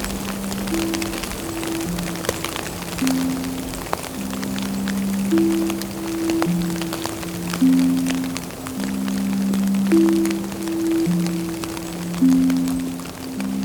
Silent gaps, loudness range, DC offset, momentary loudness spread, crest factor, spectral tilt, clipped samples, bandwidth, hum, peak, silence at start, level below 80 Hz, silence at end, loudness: none; 5 LU; under 0.1%; 10 LU; 20 dB; -5 dB/octave; under 0.1%; over 20 kHz; none; -2 dBFS; 0 s; -42 dBFS; 0 s; -22 LUFS